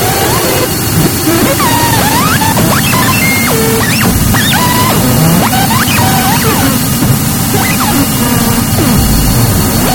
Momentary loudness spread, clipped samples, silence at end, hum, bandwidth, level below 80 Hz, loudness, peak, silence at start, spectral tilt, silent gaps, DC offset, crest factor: 2 LU; 0.3%; 0 s; none; 19.5 kHz; -22 dBFS; -8 LUFS; 0 dBFS; 0 s; -4 dB/octave; none; 0.4%; 8 dB